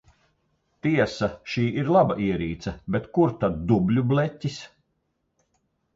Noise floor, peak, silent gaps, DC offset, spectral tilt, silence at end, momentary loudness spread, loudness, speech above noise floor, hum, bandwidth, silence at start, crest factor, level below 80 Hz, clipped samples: -74 dBFS; -8 dBFS; none; under 0.1%; -7.5 dB/octave; 1.3 s; 11 LU; -24 LUFS; 51 dB; none; 7.8 kHz; 0.85 s; 18 dB; -48 dBFS; under 0.1%